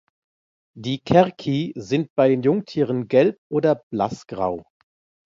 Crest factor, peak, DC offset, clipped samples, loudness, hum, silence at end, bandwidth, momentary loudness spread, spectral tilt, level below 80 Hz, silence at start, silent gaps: 20 dB; -2 dBFS; under 0.1%; under 0.1%; -21 LUFS; none; 0.7 s; 7.6 kHz; 9 LU; -7.5 dB/octave; -56 dBFS; 0.75 s; 2.10-2.16 s, 3.38-3.50 s, 3.83-3.91 s